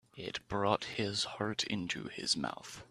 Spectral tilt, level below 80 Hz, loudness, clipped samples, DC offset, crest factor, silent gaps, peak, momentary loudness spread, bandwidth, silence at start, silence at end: -3.5 dB/octave; -66 dBFS; -35 LUFS; under 0.1%; under 0.1%; 24 dB; none; -12 dBFS; 9 LU; 14 kHz; 0.15 s; 0.05 s